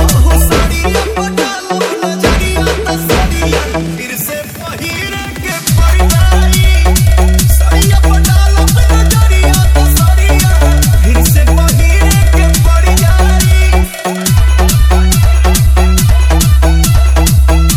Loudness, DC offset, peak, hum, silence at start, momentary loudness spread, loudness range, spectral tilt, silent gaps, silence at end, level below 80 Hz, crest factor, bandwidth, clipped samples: -10 LUFS; under 0.1%; 0 dBFS; none; 0 s; 7 LU; 5 LU; -4.5 dB/octave; none; 0 s; -10 dBFS; 8 dB; 16.5 kHz; 0.8%